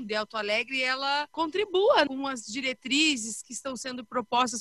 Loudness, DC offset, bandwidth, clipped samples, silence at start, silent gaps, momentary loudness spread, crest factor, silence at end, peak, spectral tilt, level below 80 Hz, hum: -27 LUFS; under 0.1%; 12.5 kHz; under 0.1%; 0 s; none; 11 LU; 18 dB; 0 s; -10 dBFS; -1.5 dB/octave; -68 dBFS; none